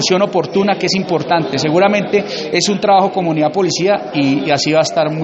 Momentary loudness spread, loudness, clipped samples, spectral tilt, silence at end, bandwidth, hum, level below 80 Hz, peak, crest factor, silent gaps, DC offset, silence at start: 4 LU; -14 LUFS; under 0.1%; -4.5 dB/octave; 0 s; 8.2 kHz; none; -56 dBFS; 0 dBFS; 14 dB; none; under 0.1%; 0 s